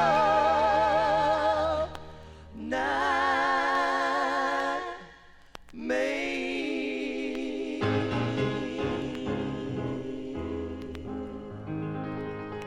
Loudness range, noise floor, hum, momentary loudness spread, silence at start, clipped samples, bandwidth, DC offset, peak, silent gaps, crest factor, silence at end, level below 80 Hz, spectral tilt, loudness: 8 LU; -52 dBFS; none; 14 LU; 0 s; under 0.1%; 12.5 kHz; under 0.1%; -12 dBFS; none; 16 dB; 0 s; -52 dBFS; -5.5 dB/octave; -28 LUFS